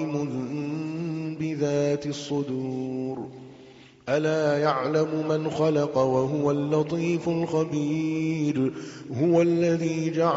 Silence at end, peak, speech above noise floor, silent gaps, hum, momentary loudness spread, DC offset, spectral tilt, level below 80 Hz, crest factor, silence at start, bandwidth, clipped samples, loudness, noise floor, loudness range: 0 s; -8 dBFS; 25 dB; none; none; 8 LU; under 0.1%; -6.5 dB/octave; -64 dBFS; 18 dB; 0 s; 7.8 kHz; under 0.1%; -26 LUFS; -50 dBFS; 5 LU